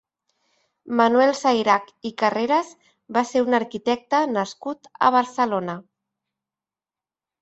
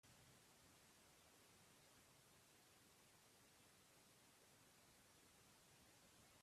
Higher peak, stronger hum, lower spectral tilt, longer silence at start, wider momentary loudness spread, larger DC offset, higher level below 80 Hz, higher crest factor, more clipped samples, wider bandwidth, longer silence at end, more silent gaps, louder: first, -4 dBFS vs -58 dBFS; neither; first, -4.5 dB/octave vs -2.5 dB/octave; first, 0.85 s vs 0.05 s; first, 14 LU vs 1 LU; neither; first, -70 dBFS vs under -90 dBFS; first, 20 dB vs 14 dB; neither; second, 8.2 kHz vs 14.5 kHz; first, 1.6 s vs 0 s; neither; first, -21 LUFS vs -70 LUFS